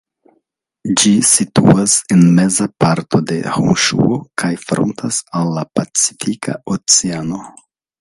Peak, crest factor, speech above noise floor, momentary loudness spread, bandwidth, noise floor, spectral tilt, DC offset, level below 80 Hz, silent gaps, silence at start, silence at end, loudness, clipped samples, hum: 0 dBFS; 14 dB; 52 dB; 10 LU; 11.5 kHz; -66 dBFS; -4 dB/octave; under 0.1%; -48 dBFS; none; 0.85 s; 0.5 s; -14 LUFS; under 0.1%; none